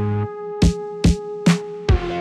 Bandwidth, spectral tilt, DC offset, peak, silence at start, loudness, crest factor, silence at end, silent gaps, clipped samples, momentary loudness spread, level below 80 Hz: 12 kHz; -6.5 dB/octave; under 0.1%; -6 dBFS; 0 s; -21 LUFS; 14 dB; 0 s; none; under 0.1%; 5 LU; -26 dBFS